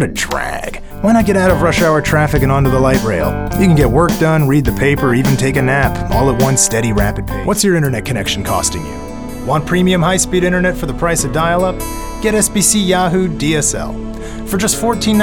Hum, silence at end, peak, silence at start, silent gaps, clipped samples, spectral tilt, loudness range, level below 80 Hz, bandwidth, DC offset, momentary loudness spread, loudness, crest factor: none; 0 s; 0 dBFS; 0 s; none; under 0.1%; -4.5 dB/octave; 3 LU; -26 dBFS; over 20 kHz; under 0.1%; 10 LU; -13 LUFS; 14 dB